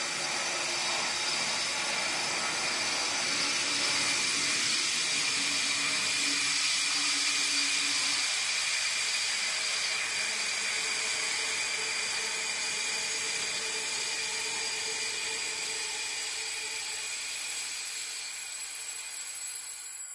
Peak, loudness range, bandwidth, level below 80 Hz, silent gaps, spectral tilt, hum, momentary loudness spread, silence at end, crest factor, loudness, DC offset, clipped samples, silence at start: -16 dBFS; 6 LU; 11.5 kHz; -74 dBFS; none; 1 dB/octave; none; 8 LU; 0 s; 16 dB; -28 LUFS; under 0.1%; under 0.1%; 0 s